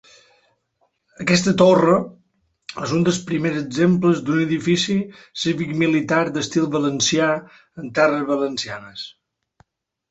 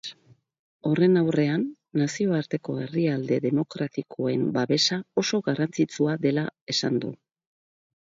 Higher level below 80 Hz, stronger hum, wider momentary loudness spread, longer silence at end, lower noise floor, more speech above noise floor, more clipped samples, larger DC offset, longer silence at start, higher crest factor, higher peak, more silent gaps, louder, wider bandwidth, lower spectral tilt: first, -58 dBFS vs -68 dBFS; neither; first, 16 LU vs 8 LU; about the same, 1 s vs 1.05 s; first, -68 dBFS vs -58 dBFS; first, 49 dB vs 33 dB; neither; neither; first, 1.2 s vs 0.05 s; about the same, 18 dB vs 18 dB; first, -2 dBFS vs -8 dBFS; second, none vs 0.59-0.80 s, 6.62-6.67 s; first, -19 LUFS vs -25 LUFS; about the same, 8.2 kHz vs 7.8 kHz; about the same, -5 dB/octave vs -5.5 dB/octave